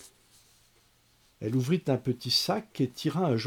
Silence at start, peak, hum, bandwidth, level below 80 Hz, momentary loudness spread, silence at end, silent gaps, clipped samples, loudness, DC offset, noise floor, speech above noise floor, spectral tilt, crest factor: 0 s; -14 dBFS; none; 19 kHz; -68 dBFS; 6 LU; 0 s; none; under 0.1%; -29 LUFS; under 0.1%; -65 dBFS; 36 dB; -5.5 dB/octave; 18 dB